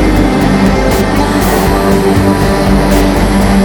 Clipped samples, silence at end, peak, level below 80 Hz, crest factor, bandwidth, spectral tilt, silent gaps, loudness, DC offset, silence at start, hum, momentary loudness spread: under 0.1%; 0 s; 0 dBFS; -16 dBFS; 8 dB; over 20 kHz; -6 dB/octave; none; -10 LUFS; under 0.1%; 0 s; none; 1 LU